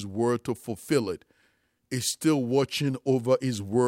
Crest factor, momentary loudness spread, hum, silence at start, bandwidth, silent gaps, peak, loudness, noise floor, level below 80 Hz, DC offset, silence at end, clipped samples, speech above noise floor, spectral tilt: 16 dB; 10 LU; none; 0 s; 16.5 kHz; none; -10 dBFS; -27 LUFS; -69 dBFS; -66 dBFS; under 0.1%; 0 s; under 0.1%; 43 dB; -5 dB/octave